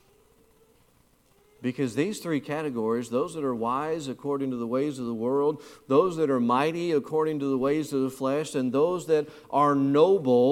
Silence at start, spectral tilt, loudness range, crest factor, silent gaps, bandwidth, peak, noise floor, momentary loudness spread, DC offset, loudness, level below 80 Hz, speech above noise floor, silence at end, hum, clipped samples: 1.6 s; -6.5 dB/octave; 5 LU; 18 dB; none; 15.5 kHz; -8 dBFS; -63 dBFS; 9 LU; under 0.1%; -26 LUFS; -68 dBFS; 37 dB; 0 s; none; under 0.1%